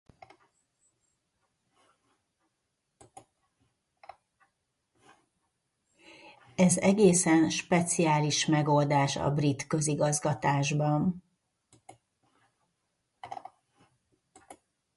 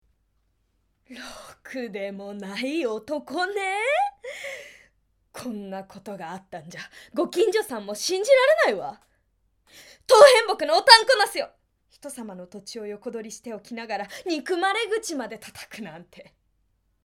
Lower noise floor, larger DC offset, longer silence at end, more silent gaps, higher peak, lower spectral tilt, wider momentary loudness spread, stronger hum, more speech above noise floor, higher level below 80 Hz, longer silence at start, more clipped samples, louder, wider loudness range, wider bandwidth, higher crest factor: first, -81 dBFS vs -70 dBFS; neither; second, 0.45 s vs 0.85 s; neither; second, -10 dBFS vs 0 dBFS; first, -5 dB/octave vs -2 dB/octave; second, 16 LU vs 26 LU; neither; first, 55 dB vs 47 dB; about the same, -64 dBFS vs -68 dBFS; first, 6.25 s vs 1.1 s; neither; second, -26 LUFS vs -21 LUFS; second, 10 LU vs 14 LU; second, 11.5 kHz vs 16.5 kHz; about the same, 22 dB vs 24 dB